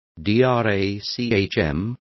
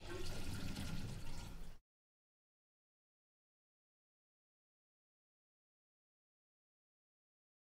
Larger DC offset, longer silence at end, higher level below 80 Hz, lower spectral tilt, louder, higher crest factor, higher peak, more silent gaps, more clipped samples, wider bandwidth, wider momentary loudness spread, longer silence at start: neither; second, 0.2 s vs 6 s; first, -42 dBFS vs -54 dBFS; first, -7 dB/octave vs -5 dB/octave; first, -21 LUFS vs -49 LUFS; about the same, 16 dB vs 18 dB; first, -6 dBFS vs -32 dBFS; neither; neither; second, 6.2 kHz vs 16 kHz; second, 7 LU vs 13 LU; first, 0.15 s vs 0 s